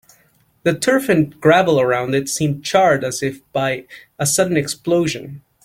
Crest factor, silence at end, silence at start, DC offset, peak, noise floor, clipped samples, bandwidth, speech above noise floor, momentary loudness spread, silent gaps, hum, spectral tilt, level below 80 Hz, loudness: 16 dB; 0.25 s; 0.65 s; under 0.1%; -2 dBFS; -57 dBFS; under 0.1%; 17 kHz; 40 dB; 9 LU; none; none; -4.5 dB/octave; -54 dBFS; -17 LUFS